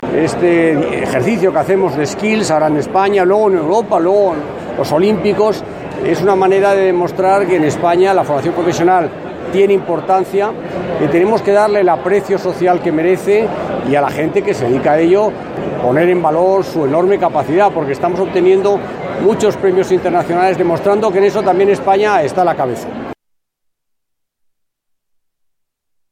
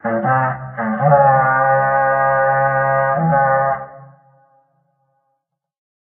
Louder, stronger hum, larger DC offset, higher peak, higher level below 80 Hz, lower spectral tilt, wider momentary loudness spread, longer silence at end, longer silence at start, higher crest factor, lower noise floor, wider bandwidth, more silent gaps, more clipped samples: about the same, -13 LUFS vs -15 LUFS; neither; neither; about the same, 0 dBFS vs -2 dBFS; about the same, -50 dBFS vs -54 dBFS; second, -6.5 dB/octave vs -11.5 dB/octave; about the same, 7 LU vs 9 LU; first, 3 s vs 2 s; about the same, 0 s vs 0.05 s; about the same, 12 dB vs 16 dB; about the same, -75 dBFS vs -73 dBFS; first, 14.5 kHz vs 3.1 kHz; neither; neither